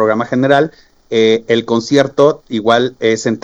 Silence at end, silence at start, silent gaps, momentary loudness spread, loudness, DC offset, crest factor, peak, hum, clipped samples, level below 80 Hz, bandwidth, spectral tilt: 0.05 s; 0 s; none; 4 LU; -13 LUFS; under 0.1%; 14 dB; 0 dBFS; none; under 0.1%; -54 dBFS; 8 kHz; -5 dB/octave